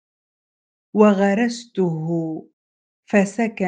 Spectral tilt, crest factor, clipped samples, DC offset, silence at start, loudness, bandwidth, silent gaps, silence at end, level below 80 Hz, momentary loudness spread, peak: -7 dB/octave; 20 dB; under 0.1%; under 0.1%; 0.95 s; -20 LUFS; 9.2 kHz; 2.53-3.03 s; 0 s; -68 dBFS; 11 LU; 0 dBFS